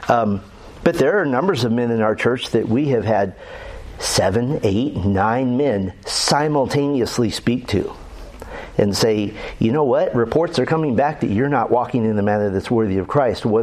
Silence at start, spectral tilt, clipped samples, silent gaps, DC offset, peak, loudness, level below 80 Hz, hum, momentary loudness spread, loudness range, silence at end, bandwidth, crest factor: 0 s; -5.5 dB/octave; under 0.1%; none; under 0.1%; 0 dBFS; -19 LUFS; -44 dBFS; none; 9 LU; 2 LU; 0 s; 15.5 kHz; 18 dB